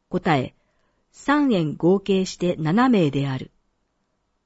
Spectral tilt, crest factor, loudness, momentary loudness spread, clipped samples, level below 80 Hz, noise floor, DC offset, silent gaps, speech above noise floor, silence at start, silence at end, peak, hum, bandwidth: -6.5 dB/octave; 16 dB; -21 LUFS; 12 LU; under 0.1%; -54 dBFS; -72 dBFS; under 0.1%; none; 51 dB; 0.1 s; 1 s; -8 dBFS; none; 8 kHz